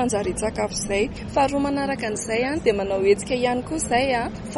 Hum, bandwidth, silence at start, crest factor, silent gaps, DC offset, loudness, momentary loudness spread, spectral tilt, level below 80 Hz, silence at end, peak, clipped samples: none; 11.5 kHz; 0 s; 16 dB; none; under 0.1%; -23 LUFS; 5 LU; -4 dB/octave; -42 dBFS; 0 s; -6 dBFS; under 0.1%